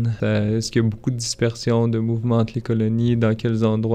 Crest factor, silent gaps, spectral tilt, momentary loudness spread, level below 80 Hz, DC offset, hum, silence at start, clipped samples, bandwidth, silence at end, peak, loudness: 14 dB; none; -6.5 dB/octave; 3 LU; -46 dBFS; under 0.1%; none; 0 s; under 0.1%; 10 kHz; 0 s; -6 dBFS; -21 LUFS